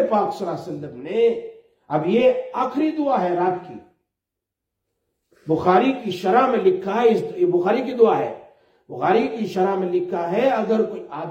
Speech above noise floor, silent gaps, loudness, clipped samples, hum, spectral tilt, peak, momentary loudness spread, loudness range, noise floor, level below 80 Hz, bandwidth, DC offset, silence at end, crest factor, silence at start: 64 dB; none; -20 LUFS; under 0.1%; none; -7 dB/octave; -2 dBFS; 13 LU; 4 LU; -84 dBFS; -66 dBFS; 8.6 kHz; under 0.1%; 0 s; 18 dB; 0 s